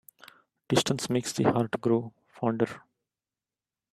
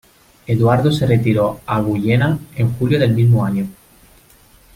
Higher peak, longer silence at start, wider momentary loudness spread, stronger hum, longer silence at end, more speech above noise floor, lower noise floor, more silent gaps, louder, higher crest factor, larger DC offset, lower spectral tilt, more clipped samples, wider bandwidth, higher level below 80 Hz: second, -8 dBFS vs -2 dBFS; first, 0.7 s vs 0.5 s; about the same, 6 LU vs 7 LU; neither; about the same, 1.15 s vs 1.05 s; first, over 63 dB vs 34 dB; first, under -90 dBFS vs -49 dBFS; neither; second, -28 LUFS vs -16 LUFS; first, 22 dB vs 14 dB; neither; second, -5 dB/octave vs -8 dB/octave; neither; about the same, 14.5 kHz vs 15.5 kHz; second, -66 dBFS vs -44 dBFS